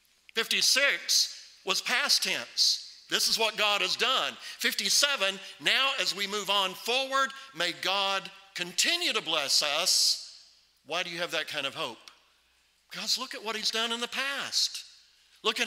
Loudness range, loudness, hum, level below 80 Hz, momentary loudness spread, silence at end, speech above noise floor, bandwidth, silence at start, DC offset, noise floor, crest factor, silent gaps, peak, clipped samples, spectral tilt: 6 LU; -27 LUFS; none; -80 dBFS; 10 LU; 0 s; 39 dB; 16 kHz; 0.35 s; under 0.1%; -68 dBFS; 24 dB; none; -6 dBFS; under 0.1%; 0.5 dB/octave